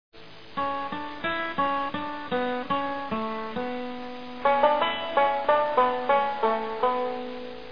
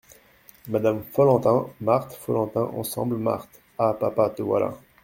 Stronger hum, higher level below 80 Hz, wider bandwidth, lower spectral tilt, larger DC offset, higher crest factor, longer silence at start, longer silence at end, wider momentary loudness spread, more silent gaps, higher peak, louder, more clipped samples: neither; about the same, -60 dBFS vs -60 dBFS; second, 5.4 kHz vs 17 kHz; about the same, -6.5 dB/octave vs -7 dB/octave; first, 0.8% vs under 0.1%; about the same, 20 dB vs 18 dB; second, 0.1 s vs 0.65 s; second, 0 s vs 0.25 s; first, 12 LU vs 8 LU; neither; about the same, -8 dBFS vs -6 dBFS; second, -27 LUFS vs -24 LUFS; neither